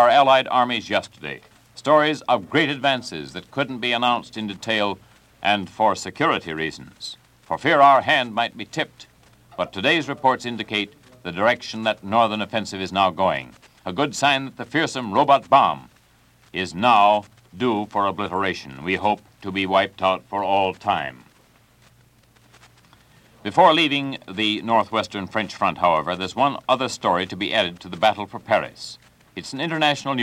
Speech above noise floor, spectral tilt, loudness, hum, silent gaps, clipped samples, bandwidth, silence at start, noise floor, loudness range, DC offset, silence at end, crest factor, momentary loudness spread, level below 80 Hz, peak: 35 dB; -4.5 dB/octave; -21 LUFS; none; none; under 0.1%; 15 kHz; 0 s; -56 dBFS; 4 LU; under 0.1%; 0 s; 20 dB; 15 LU; -60 dBFS; -2 dBFS